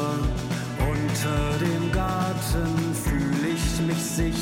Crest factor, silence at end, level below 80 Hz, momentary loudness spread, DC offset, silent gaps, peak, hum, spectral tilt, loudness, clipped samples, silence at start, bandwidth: 10 dB; 0 s; -32 dBFS; 2 LU; under 0.1%; none; -14 dBFS; none; -5.5 dB/octave; -25 LUFS; under 0.1%; 0 s; 17 kHz